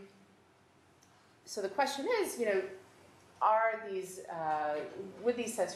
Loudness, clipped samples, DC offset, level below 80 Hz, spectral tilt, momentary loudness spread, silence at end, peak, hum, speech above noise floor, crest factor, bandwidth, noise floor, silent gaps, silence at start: -34 LUFS; under 0.1%; under 0.1%; -84 dBFS; -3 dB/octave; 13 LU; 0 s; -16 dBFS; none; 31 dB; 20 dB; 13 kHz; -65 dBFS; none; 0 s